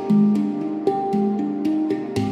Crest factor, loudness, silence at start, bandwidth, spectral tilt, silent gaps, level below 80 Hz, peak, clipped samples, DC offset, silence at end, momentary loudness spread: 14 dB; -21 LUFS; 0 s; 9.8 kHz; -8.5 dB/octave; none; -60 dBFS; -6 dBFS; under 0.1%; under 0.1%; 0 s; 6 LU